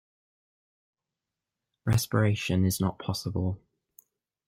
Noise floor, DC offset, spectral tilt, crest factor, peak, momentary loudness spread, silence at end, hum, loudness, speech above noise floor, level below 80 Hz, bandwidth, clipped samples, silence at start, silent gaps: -89 dBFS; under 0.1%; -5.5 dB/octave; 20 dB; -10 dBFS; 8 LU; 0.9 s; none; -28 LUFS; 62 dB; -56 dBFS; 16 kHz; under 0.1%; 1.85 s; none